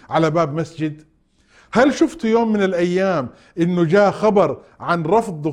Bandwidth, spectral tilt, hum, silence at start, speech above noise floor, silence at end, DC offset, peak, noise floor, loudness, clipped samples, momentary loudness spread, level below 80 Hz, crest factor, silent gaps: 11.5 kHz; -7 dB/octave; none; 0.1 s; 38 dB; 0 s; under 0.1%; -2 dBFS; -56 dBFS; -18 LUFS; under 0.1%; 9 LU; -52 dBFS; 16 dB; none